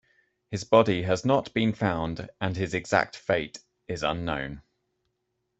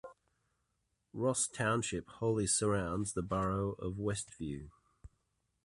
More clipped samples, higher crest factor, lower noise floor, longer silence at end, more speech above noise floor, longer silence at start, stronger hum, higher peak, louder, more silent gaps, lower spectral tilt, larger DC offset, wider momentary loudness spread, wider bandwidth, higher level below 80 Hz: neither; about the same, 22 dB vs 18 dB; second, -78 dBFS vs -82 dBFS; first, 1 s vs 0.6 s; first, 52 dB vs 47 dB; first, 0.5 s vs 0.05 s; neither; first, -4 dBFS vs -20 dBFS; first, -27 LUFS vs -35 LUFS; neither; first, -6 dB/octave vs -4.5 dB/octave; neither; first, 15 LU vs 12 LU; second, 8.2 kHz vs 11.5 kHz; about the same, -54 dBFS vs -56 dBFS